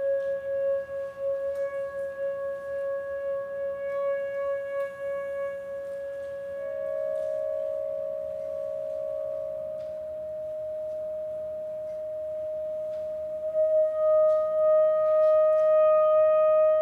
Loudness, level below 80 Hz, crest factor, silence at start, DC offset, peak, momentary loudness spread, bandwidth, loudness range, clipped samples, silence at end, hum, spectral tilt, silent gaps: -28 LUFS; -66 dBFS; 12 dB; 0 s; under 0.1%; -16 dBFS; 14 LU; 4 kHz; 11 LU; under 0.1%; 0 s; none; -5.5 dB/octave; none